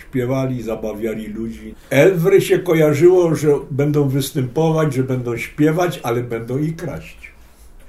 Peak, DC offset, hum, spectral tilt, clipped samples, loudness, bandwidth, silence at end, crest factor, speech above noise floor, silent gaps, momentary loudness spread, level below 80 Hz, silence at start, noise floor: 0 dBFS; under 0.1%; none; -7 dB/octave; under 0.1%; -17 LUFS; 15.5 kHz; 0 s; 16 dB; 26 dB; none; 15 LU; -44 dBFS; 0 s; -42 dBFS